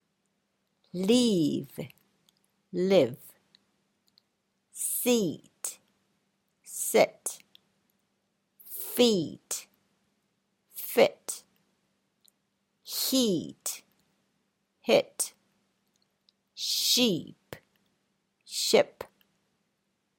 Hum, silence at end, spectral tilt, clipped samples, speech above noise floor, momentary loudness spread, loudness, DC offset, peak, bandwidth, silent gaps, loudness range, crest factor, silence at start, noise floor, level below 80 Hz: none; 1.15 s; -3.5 dB/octave; under 0.1%; 51 dB; 19 LU; -28 LUFS; under 0.1%; -8 dBFS; 17 kHz; none; 4 LU; 24 dB; 0.95 s; -78 dBFS; -74 dBFS